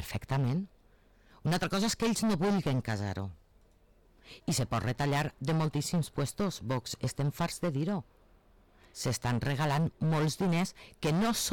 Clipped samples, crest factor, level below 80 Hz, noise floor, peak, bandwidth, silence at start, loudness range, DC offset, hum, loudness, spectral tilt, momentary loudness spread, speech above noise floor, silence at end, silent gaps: under 0.1%; 8 dB; -54 dBFS; -63 dBFS; -24 dBFS; 19 kHz; 0 s; 3 LU; under 0.1%; none; -32 LUFS; -5.5 dB/octave; 8 LU; 32 dB; 0 s; none